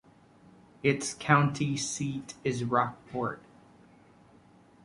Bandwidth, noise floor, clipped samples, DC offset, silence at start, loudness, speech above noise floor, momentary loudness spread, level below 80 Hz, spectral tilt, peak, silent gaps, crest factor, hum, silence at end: 11.5 kHz; -58 dBFS; under 0.1%; under 0.1%; 0.85 s; -30 LUFS; 29 dB; 10 LU; -66 dBFS; -5 dB/octave; -6 dBFS; none; 26 dB; none; 1.45 s